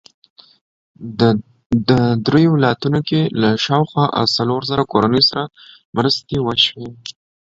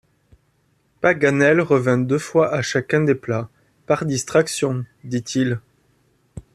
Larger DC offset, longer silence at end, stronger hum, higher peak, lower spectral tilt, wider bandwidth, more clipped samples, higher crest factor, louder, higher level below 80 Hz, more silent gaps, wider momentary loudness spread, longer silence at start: neither; first, 0.35 s vs 0.15 s; neither; about the same, 0 dBFS vs -2 dBFS; about the same, -6.5 dB/octave vs -5.5 dB/octave; second, 7.8 kHz vs 14 kHz; neither; about the same, 18 dB vs 18 dB; first, -16 LUFS vs -20 LUFS; first, -48 dBFS vs -56 dBFS; first, 1.66-1.70 s, 5.85-5.93 s vs none; first, 15 LU vs 11 LU; about the same, 1 s vs 1 s